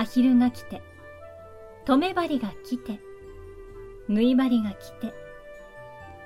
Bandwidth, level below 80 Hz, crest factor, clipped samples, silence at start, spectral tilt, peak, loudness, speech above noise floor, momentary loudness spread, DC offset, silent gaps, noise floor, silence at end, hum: 14 kHz; -54 dBFS; 20 dB; under 0.1%; 0 s; -6.5 dB/octave; -8 dBFS; -25 LUFS; 21 dB; 24 LU; under 0.1%; none; -45 dBFS; 0 s; none